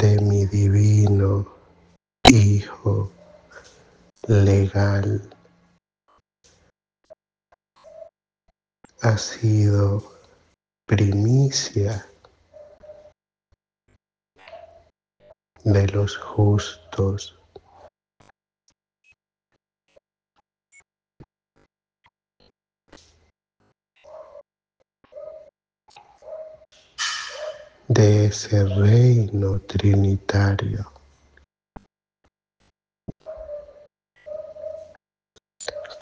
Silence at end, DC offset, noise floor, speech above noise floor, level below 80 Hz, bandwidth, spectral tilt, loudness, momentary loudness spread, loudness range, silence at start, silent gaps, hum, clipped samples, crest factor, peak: 0.05 s; under 0.1%; -76 dBFS; 57 dB; -48 dBFS; 8.8 kHz; -6 dB/octave; -20 LUFS; 23 LU; 21 LU; 0 s; none; none; under 0.1%; 24 dB; 0 dBFS